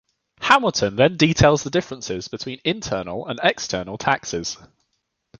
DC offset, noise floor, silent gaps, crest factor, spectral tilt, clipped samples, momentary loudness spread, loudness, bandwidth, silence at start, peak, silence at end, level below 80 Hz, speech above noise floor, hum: under 0.1%; -74 dBFS; none; 22 dB; -4.5 dB/octave; under 0.1%; 13 LU; -21 LUFS; 9.8 kHz; 0.4 s; 0 dBFS; 0.85 s; -46 dBFS; 53 dB; none